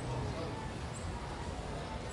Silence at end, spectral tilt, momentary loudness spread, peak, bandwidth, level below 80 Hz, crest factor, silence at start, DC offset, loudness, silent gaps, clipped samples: 0 s; -5.5 dB/octave; 3 LU; -26 dBFS; 11.5 kHz; -48 dBFS; 14 dB; 0 s; under 0.1%; -41 LUFS; none; under 0.1%